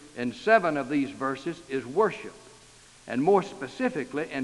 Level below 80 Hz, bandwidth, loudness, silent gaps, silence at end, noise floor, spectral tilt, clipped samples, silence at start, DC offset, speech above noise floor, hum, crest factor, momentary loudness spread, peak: -64 dBFS; 11.5 kHz; -27 LUFS; none; 0 s; -53 dBFS; -6 dB/octave; under 0.1%; 0 s; under 0.1%; 27 dB; none; 22 dB; 13 LU; -6 dBFS